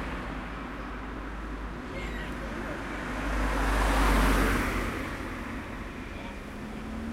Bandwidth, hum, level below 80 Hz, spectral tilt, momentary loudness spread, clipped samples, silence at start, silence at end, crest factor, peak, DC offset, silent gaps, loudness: 16 kHz; none; -34 dBFS; -5 dB/octave; 14 LU; under 0.1%; 0 s; 0 s; 18 dB; -12 dBFS; under 0.1%; none; -32 LUFS